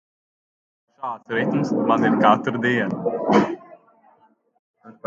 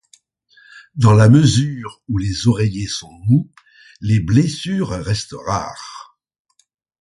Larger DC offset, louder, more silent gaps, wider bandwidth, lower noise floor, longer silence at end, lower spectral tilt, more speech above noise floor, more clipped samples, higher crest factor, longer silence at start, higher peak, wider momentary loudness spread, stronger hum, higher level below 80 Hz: neither; second, -20 LUFS vs -17 LUFS; first, 4.59-4.74 s vs none; second, 7.6 kHz vs 11.5 kHz; first, -59 dBFS vs -55 dBFS; second, 0.15 s vs 1 s; about the same, -7 dB/octave vs -6.5 dB/octave; about the same, 39 dB vs 39 dB; neither; first, 22 dB vs 16 dB; first, 1 s vs 0.75 s; about the same, -2 dBFS vs 0 dBFS; second, 15 LU vs 20 LU; neither; second, -64 dBFS vs -40 dBFS